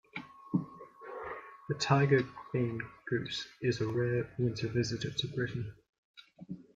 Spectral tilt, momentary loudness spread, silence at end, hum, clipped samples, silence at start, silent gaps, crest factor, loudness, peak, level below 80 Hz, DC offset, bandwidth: -6 dB/octave; 17 LU; 0.15 s; none; under 0.1%; 0.15 s; 5.89-6.14 s; 22 dB; -34 LUFS; -12 dBFS; -64 dBFS; under 0.1%; 7.8 kHz